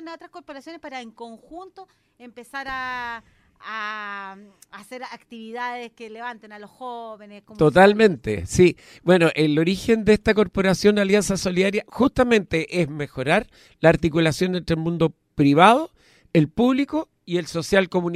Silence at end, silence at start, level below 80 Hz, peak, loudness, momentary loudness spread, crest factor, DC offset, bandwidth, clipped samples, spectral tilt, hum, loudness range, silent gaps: 0 s; 0 s; -46 dBFS; 0 dBFS; -20 LUFS; 21 LU; 20 dB; under 0.1%; 15 kHz; under 0.1%; -5.5 dB/octave; none; 15 LU; none